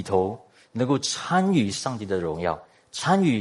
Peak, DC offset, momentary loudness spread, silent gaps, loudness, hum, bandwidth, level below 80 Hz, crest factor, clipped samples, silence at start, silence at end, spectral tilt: -6 dBFS; under 0.1%; 14 LU; none; -25 LUFS; none; 11.5 kHz; -60 dBFS; 18 dB; under 0.1%; 0 s; 0 s; -5 dB/octave